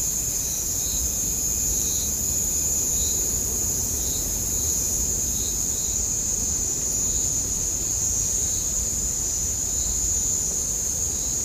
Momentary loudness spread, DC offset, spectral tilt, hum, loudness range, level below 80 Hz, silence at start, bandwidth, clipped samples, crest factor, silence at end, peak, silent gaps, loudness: 2 LU; under 0.1%; -1.5 dB/octave; none; 1 LU; -36 dBFS; 0 s; 15.5 kHz; under 0.1%; 16 dB; 0 s; -10 dBFS; none; -22 LUFS